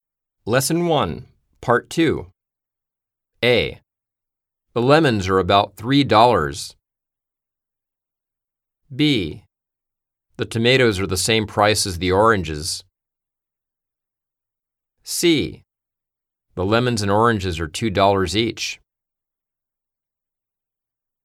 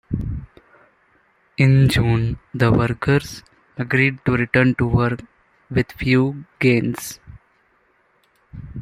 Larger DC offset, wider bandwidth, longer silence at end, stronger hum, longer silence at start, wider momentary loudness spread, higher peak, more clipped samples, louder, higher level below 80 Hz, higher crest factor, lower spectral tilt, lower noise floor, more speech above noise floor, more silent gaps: neither; about the same, 16.5 kHz vs 15.5 kHz; first, 2.5 s vs 0 s; neither; first, 0.45 s vs 0.1 s; second, 14 LU vs 18 LU; about the same, 0 dBFS vs -2 dBFS; neither; about the same, -18 LUFS vs -19 LUFS; second, -48 dBFS vs -40 dBFS; about the same, 20 dB vs 18 dB; second, -4.5 dB/octave vs -7 dB/octave; first, -86 dBFS vs -61 dBFS; first, 68 dB vs 43 dB; neither